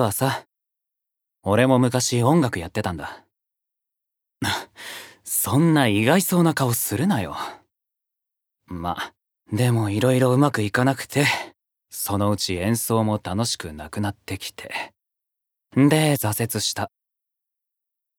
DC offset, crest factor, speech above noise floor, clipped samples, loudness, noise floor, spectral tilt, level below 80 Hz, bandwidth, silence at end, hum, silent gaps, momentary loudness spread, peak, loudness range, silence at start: under 0.1%; 22 dB; 63 dB; under 0.1%; -22 LUFS; -84 dBFS; -5 dB/octave; -56 dBFS; over 20 kHz; 1.3 s; none; none; 15 LU; -2 dBFS; 5 LU; 0 s